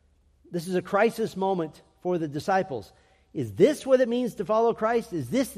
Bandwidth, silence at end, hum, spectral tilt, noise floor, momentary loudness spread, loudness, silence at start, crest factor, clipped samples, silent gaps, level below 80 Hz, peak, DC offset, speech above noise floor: 15 kHz; 0 s; none; -6 dB/octave; -60 dBFS; 12 LU; -26 LUFS; 0.5 s; 18 dB; under 0.1%; none; -62 dBFS; -8 dBFS; under 0.1%; 34 dB